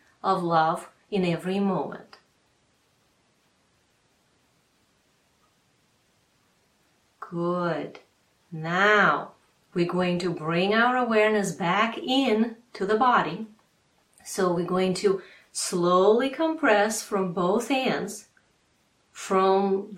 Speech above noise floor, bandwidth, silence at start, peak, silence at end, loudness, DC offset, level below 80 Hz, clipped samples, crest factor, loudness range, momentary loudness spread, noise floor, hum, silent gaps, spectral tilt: 43 dB; 15.5 kHz; 0.25 s; -6 dBFS; 0 s; -24 LUFS; under 0.1%; -68 dBFS; under 0.1%; 20 dB; 12 LU; 15 LU; -67 dBFS; none; none; -5 dB/octave